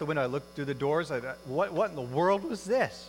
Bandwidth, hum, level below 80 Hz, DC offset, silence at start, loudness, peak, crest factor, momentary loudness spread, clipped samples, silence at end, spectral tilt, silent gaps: 16.5 kHz; none; -62 dBFS; under 0.1%; 0 s; -30 LUFS; -14 dBFS; 16 dB; 7 LU; under 0.1%; 0 s; -6 dB/octave; none